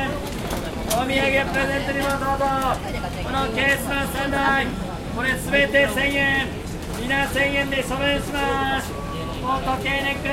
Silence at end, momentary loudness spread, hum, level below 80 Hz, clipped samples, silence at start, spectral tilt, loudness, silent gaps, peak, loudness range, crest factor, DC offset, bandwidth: 0 s; 9 LU; none; -36 dBFS; under 0.1%; 0 s; -4.5 dB/octave; -22 LUFS; none; -4 dBFS; 2 LU; 18 dB; under 0.1%; 16.5 kHz